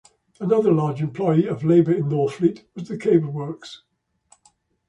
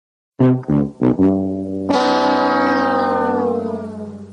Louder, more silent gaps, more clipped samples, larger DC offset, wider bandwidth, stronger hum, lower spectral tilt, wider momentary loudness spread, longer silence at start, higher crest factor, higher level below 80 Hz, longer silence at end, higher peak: second, -21 LUFS vs -17 LUFS; neither; neither; neither; about the same, 8.8 kHz vs 9.6 kHz; neither; first, -9 dB/octave vs -7 dB/octave; first, 15 LU vs 9 LU; about the same, 0.4 s vs 0.4 s; about the same, 18 dB vs 14 dB; second, -62 dBFS vs -48 dBFS; first, 1.15 s vs 0 s; about the same, -4 dBFS vs -4 dBFS